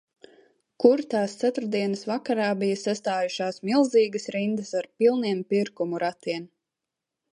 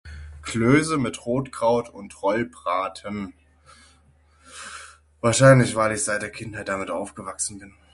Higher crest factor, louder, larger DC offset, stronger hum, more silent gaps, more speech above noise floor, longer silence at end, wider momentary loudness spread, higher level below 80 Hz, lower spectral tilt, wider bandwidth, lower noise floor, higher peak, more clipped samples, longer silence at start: about the same, 20 dB vs 22 dB; about the same, -25 LUFS vs -23 LUFS; neither; neither; neither; first, 62 dB vs 35 dB; first, 0.85 s vs 0.25 s; second, 8 LU vs 21 LU; second, -76 dBFS vs -50 dBFS; about the same, -5.5 dB/octave vs -5 dB/octave; about the same, 10.5 kHz vs 11.5 kHz; first, -86 dBFS vs -57 dBFS; second, -4 dBFS vs 0 dBFS; neither; first, 0.8 s vs 0.05 s